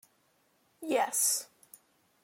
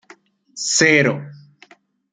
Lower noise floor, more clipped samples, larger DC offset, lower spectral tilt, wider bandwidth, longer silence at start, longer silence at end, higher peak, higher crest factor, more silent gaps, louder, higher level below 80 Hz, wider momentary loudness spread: first, -71 dBFS vs -51 dBFS; neither; neither; second, 0 dB/octave vs -3 dB/octave; first, 16.5 kHz vs 10 kHz; first, 0.8 s vs 0.55 s; about the same, 0.8 s vs 0.75 s; second, -16 dBFS vs -2 dBFS; about the same, 20 dB vs 20 dB; neither; second, -29 LUFS vs -15 LUFS; second, -88 dBFS vs -62 dBFS; about the same, 19 LU vs 18 LU